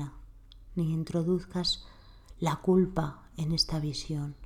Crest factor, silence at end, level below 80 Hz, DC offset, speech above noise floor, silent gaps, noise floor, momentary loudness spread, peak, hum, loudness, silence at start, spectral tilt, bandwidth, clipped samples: 18 dB; 0 s; -48 dBFS; under 0.1%; 21 dB; none; -50 dBFS; 10 LU; -14 dBFS; none; -30 LUFS; 0 s; -6 dB/octave; 15 kHz; under 0.1%